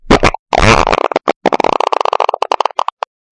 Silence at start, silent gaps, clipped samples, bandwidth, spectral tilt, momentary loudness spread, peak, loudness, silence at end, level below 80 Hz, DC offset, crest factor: 0.05 s; 0.39-0.46 s, 1.36-1.41 s; under 0.1%; 11.5 kHz; -4.5 dB/octave; 8 LU; 0 dBFS; -13 LUFS; 0.75 s; -24 dBFS; under 0.1%; 12 dB